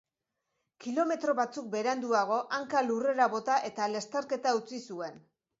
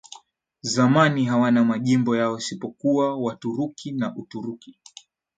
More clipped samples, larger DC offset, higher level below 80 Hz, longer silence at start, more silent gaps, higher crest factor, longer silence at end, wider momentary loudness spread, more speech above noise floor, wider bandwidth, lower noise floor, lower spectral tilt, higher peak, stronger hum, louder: neither; neither; second, -82 dBFS vs -68 dBFS; first, 0.8 s vs 0.1 s; neither; about the same, 18 dB vs 20 dB; second, 0.4 s vs 0.7 s; second, 12 LU vs 15 LU; first, 55 dB vs 31 dB; second, 8 kHz vs 9.2 kHz; first, -85 dBFS vs -53 dBFS; second, -3.5 dB/octave vs -5.5 dB/octave; second, -12 dBFS vs -4 dBFS; neither; second, -31 LUFS vs -22 LUFS